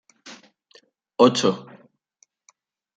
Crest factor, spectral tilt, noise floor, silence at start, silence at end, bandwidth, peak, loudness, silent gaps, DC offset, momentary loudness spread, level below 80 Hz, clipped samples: 24 dB; -4.5 dB/octave; -65 dBFS; 0.25 s; 1.35 s; 9.4 kHz; -2 dBFS; -20 LUFS; none; under 0.1%; 27 LU; -74 dBFS; under 0.1%